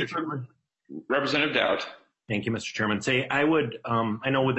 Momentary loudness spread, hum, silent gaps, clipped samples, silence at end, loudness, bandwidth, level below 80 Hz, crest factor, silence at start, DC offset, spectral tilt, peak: 14 LU; none; none; under 0.1%; 0 s; -26 LUFS; 8.4 kHz; -64 dBFS; 20 dB; 0 s; under 0.1%; -5 dB/octave; -8 dBFS